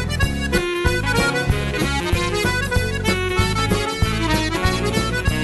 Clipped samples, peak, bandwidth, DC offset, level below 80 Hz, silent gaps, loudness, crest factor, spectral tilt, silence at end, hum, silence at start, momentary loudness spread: under 0.1%; -6 dBFS; 12.5 kHz; 0.2%; -28 dBFS; none; -20 LUFS; 14 dB; -4.5 dB/octave; 0 s; none; 0 s; 2 LU